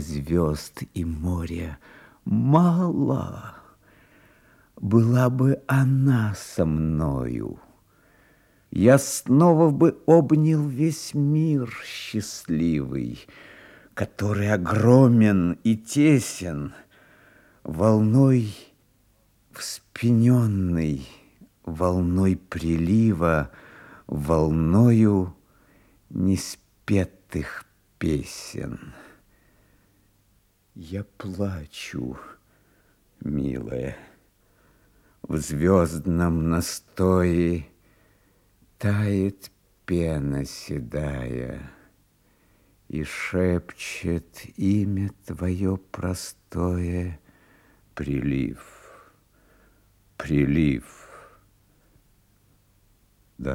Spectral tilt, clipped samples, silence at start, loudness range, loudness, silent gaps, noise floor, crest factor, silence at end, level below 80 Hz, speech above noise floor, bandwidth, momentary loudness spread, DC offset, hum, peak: -7 dB/octave; under 0.1%; 0 s; 12 LU; -23 LUFS; none; -64 dBFS; 20 dB; 0 s; -46 dBFS; 41 dB; 16 kHz; 17 LU; under 0.1%; none; -4 dBFS